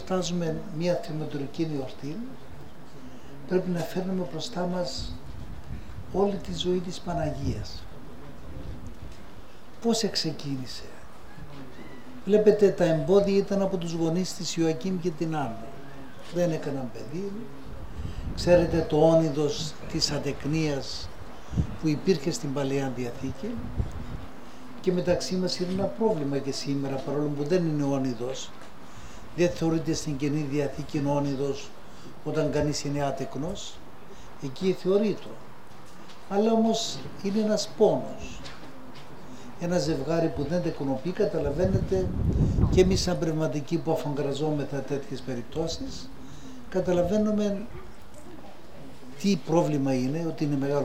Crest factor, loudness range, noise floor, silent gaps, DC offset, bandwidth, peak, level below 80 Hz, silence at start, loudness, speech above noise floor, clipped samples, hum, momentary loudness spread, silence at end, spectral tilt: 22 dB; 7 LU; -48 dBFS; none; 2%; 16 kHz; -6 dBFS; -44 dBFS; 0 s; -28 LUFS; 22 dB; under 0.1%; none; 22 LU; 0 s; -6 dB/octave